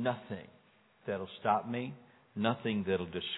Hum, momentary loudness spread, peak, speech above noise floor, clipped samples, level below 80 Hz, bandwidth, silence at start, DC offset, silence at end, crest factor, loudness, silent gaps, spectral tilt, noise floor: none; 14 LU; -14 dBFS; 31 dB; under 0.1%; -72 dBFS; 4.1 kHz; 0 s; under 0.1%; 0 s; 22 dB; -35 LUFS; none; -9 dB/octave; -66 dBFS